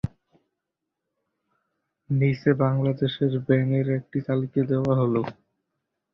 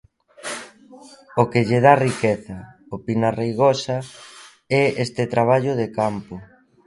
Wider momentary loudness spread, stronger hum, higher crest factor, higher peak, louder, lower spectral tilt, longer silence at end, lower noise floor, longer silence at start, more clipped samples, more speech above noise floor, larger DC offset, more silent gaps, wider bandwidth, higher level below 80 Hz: second, 6 LU vs 21 LU; neither; about the same, 20 dB vs 20 dB; second, -6 dBFS vs 0 dBFS; second, -24 LUFS vs -20 LUFS; first, -10 dB/octave vs -6 dB/octave; first, 0.8 s vs 0.4 s; first, -84 dBFS vs -40 dBFS; second, 0.05 s vs 0.45 s; neither; first, 61 dB vs 20 dB; neither; neither; second, 5.8 kHz vs 11.5 kHz; about the same, -56 dBFS vs -56 dBFS